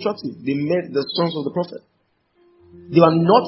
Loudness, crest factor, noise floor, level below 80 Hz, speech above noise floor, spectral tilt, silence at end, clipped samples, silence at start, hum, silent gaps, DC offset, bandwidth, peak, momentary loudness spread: -20 LUFS; 20 dB; -63 dBFS; -60 dBFS; 44 dB; -11 dB/octave; 0 s; under 0.1%; 0 s; none; none; under 0.1%; 5.8 kHz; 0 dBFS; 13 LU